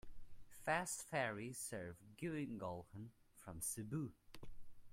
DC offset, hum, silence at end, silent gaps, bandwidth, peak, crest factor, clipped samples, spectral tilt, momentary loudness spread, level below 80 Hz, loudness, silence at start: under 0.1%; none; 0 s; none; 16 kHz; -26 dBFS; 22 dB; under 0.1%; -4 dB/octave; 20 LU; -66 dBFS; -45 LUFS; 0.05 s